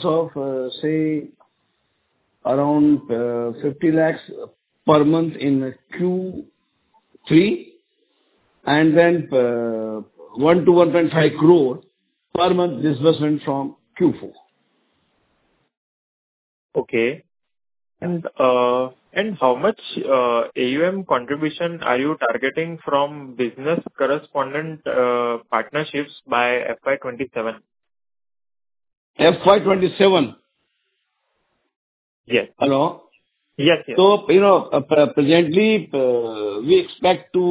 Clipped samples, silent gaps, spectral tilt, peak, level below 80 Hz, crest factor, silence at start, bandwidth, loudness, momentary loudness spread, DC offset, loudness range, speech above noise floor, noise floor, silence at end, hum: under 0.1%; 15.77-16.69 s, 28.97-29.14 s, 31.76-32.24 s; -10.5 dB/octave; 0 dBFS; -60 dBFS; 18 dB; 0 s; 4 kHz; -19 LUFS; 12 LU; under 0.1%; 8 LU; 54 dB; -72 dBFS; 0 s; none